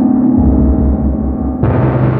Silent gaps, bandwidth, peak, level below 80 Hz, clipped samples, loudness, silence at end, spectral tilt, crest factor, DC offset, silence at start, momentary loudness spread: none; 3.5 kHz; 0 dBFS; -18 dBFS; under 0.1%; -12 LUFS; 0 s; -13 dB/octave; 10 dB; under 0.1%; 0 s; 5 LU